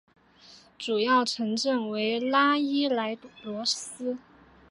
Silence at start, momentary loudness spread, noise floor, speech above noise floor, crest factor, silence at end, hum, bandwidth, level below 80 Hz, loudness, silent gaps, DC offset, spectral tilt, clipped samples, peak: 0.5 s; 13 LU; -55 dBFS; 28 dB; 18 dB; 0.55 s; none; 11.5 kHz; -72 dBFS; -27 LUFS; none; under 0.1%; -3 dB/octave; under 0.1%; -10 dBFS